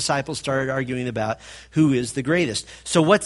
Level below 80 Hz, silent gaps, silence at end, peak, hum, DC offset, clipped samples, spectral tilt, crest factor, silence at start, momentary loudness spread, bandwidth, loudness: -52 dBFS; none; 0 s; -2 dBFS; none; under 0.1%; under 0.1%; -5 dB/octave; 20 dB; 0 s; 8 LU; 11.5 kHz; -23 LUFS